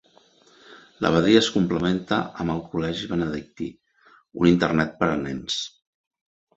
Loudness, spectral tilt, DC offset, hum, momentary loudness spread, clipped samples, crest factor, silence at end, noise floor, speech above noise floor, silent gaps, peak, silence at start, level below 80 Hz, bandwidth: -23 LUFS; -5.5 dB/octave; under 0.1%; none; 15 LU; under 0.1%; 22 dB; 0.9 s; -57 dBFS; 35 dB; none; -2 dBFS; 0.7 s; -50 dBFS; 8 kHz